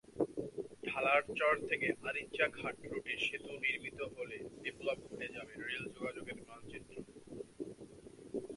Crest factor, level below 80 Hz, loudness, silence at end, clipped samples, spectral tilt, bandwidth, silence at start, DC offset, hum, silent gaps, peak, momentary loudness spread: 24 dB; -70 dBFS; -38 LUFS; 0 s; under 0.1%; -4.5 dB/octave; 11.5 kHz; 0.1 s; under 0.1%; none; none; -16 dBFS; 18 LU